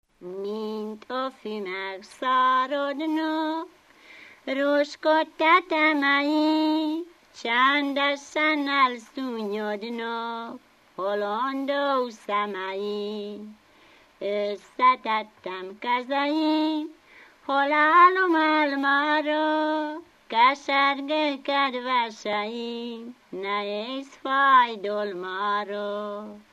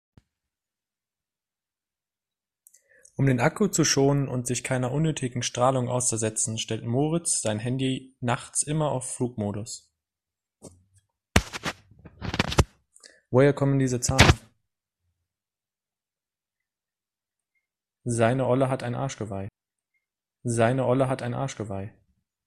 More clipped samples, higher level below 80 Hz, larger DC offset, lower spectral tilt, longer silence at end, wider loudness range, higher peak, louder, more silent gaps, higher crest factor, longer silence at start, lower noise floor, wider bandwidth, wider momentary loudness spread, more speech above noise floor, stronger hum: neither; second, -76 dBFS vs -44 dBFS; neither; about the same, -4 dB/octave vs -4.5 dB/octave; second, 0.15 s vs 0.6 s; about the same, 7 LU vs 7 LU; second, -6 dBFS vs 0 dBFS; about the same, -24 LUFS vs -25 LUFS; neither; second, 18 dB vs 28 dB; second, 0.2 s vs 3.2 s; second, -56 dBFS vs under -90 dBFS; second, 12.5 kHz vs 14 kHz; about the same, 15 LU vs 14 LU; second, 31 dB vs over 65 dB; neither